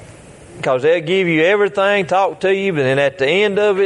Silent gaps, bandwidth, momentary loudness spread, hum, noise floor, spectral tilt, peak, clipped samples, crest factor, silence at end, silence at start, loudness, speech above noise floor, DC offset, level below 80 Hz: none; 11 kHz; 3 LU; none; -39 dBFS; -5.5 dB/octave; -2 dBFS; under 0.1%; 14 dB; 0 s; 0 s; -15 LUFS; 24 dB; under 0.1%; -56 dBFS